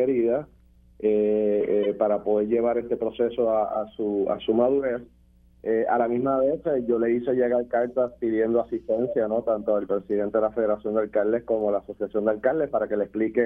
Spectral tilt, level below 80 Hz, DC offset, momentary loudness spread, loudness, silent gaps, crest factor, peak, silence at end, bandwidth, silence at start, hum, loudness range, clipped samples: -9.5 dB/octave; -56 dBFS; under 0.1%; 5 LU; -25 LUFS; none; 16 dB; -8 dBFS; 0 s; 3.7 kHz; 0 s; none; 1 LU; under 0.1%